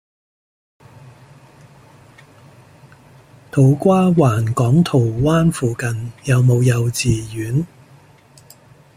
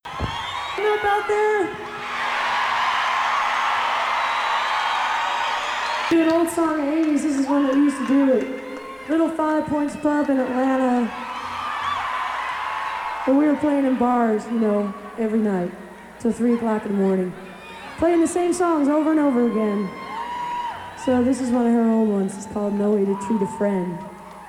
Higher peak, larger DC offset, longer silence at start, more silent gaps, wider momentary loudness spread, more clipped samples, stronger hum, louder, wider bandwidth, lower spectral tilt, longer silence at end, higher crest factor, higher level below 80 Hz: first, 0 dBFS vs -8 dBFS; neither; first, 3.55 s vs 0.05 s; neither; about the same, 9 LU vs 10 LU; neither; neither; first, -16 LUFS vs -21 LUFS; about the same, 15.5 kHz vs 15 kHz; first, -7 dB/octave vs -5 dB/octave; first, 1.3 s vs 0 s; first, 18 dB vs 12 dB; first, -44 dBFS vs -52 dBFS